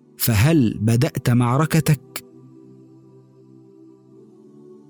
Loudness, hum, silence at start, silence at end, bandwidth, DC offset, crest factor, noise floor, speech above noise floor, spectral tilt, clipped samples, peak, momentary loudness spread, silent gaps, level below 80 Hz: -19 LUFS; none; 0.2 s; 0.15 s; over 20 kHz; under 0.1%; 14 dB; -48 dBFS; 31 dB; -6 dB/octave; under 0.1%; -8 dBFS; 7 LU; none; -48 dBFS